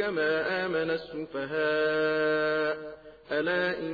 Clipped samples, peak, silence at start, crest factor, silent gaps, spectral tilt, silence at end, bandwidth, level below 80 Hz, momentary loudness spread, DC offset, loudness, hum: under 0.1%; -16 dBFS; 0 s; 12 dB; none; -7 dB/octave; 0 s; 5 kHz; -64 dBFS; 10 LU; under 0.1%; -28 LUFS; none